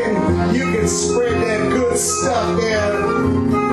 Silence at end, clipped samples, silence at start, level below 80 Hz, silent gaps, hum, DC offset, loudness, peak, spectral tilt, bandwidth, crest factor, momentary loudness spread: 0 s; under 0.1%; 0 s; -38 dBFS; none; none; under 0.1%; -17 LUFS; -6 dBFS; -4.5 dB/octave; 13 kHz; 12 dB; 1 LU